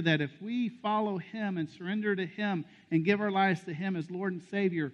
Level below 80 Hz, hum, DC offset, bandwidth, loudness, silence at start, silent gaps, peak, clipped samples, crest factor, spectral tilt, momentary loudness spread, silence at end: -76 dBFS; none; under 0.1%; 8.4 kHz; -32 LUFS; 0 s; none; -12 dBFS; under 0.1%; 18 dB; -7.5 dB/octave; 7 LU; 0 s